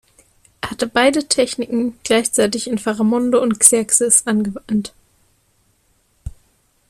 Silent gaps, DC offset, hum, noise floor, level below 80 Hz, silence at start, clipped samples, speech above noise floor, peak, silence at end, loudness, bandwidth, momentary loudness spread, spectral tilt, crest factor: none; under 0.1%; none; -61 dBFS; -46 dBFS; 0.65 s; under 0.1%; 44 dB; 0 dBFS; 0.6 s; -16 LUFS; 15.5 kHz; 19 LU; -2.5 dB/octave; 18 dB